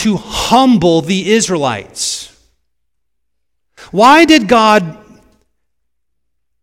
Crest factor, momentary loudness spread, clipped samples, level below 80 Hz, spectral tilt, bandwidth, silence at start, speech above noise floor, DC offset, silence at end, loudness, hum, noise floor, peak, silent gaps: 14 dB; 12 LU; 0.8%; -42 dBFS; -4 dB/octave; 17 kHz; 0 s; 65 dB; under 0.1%; 1.7 s; -10 LUFS; none; -75 dBFS; 0 dBFS; none